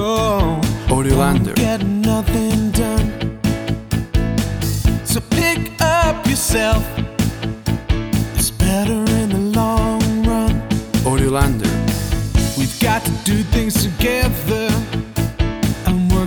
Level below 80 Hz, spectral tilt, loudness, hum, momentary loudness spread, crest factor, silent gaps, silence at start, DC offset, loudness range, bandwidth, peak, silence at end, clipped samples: -24 dBFS; -5.5 dB/octave; -18 LUFS; none; 5 LU; 16 dB; none; 0 s; under 0.1%; 2 LU; over 20 kHz; -2 dBFS; 0 s; under 0.1%